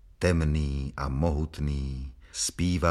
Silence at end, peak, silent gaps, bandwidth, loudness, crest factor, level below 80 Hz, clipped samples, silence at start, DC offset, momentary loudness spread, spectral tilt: 0 s; -8 dBFS; none; 13.5 kHz; -29 LUFS; 20 dB; -34 dBFS; under 0.1%; 0.2 s; under 0.1%; 9 LU; -5.5 dB/octave